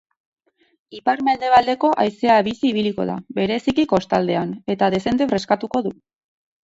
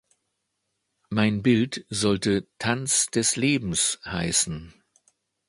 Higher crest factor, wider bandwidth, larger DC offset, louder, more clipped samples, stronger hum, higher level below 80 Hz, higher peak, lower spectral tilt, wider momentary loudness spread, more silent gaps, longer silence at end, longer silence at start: about the same, 18 dB vs 20 dB; second, 8 kHz vs 11.5 kHz; neither; first, -19 LUFS vs -24 LUFS; neither; neither; about the same, -54 dBFS vs -52 dBFS; first, -2 dBFS vs -6 dBFS; first, -6 dB/octave vs -3.5 dB/octave; about the same, 9 LU vs 7 LU; neither; about the same, 0.75 s vs 0.8 s; second, 0.9 s vs 1.1 s